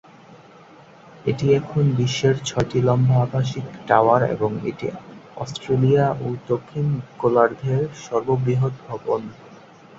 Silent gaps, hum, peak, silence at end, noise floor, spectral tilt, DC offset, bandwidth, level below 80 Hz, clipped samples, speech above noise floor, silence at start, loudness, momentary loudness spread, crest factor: none; none; -2 dBFS; 0.45 s; -47 dBFS; -7 dB/octave; under 0.1%; 7.8 kHz; -54 dBFS; under 0.1%; 26 dB; 0.3 s; -21 LUFS; 13 LU; 20 dB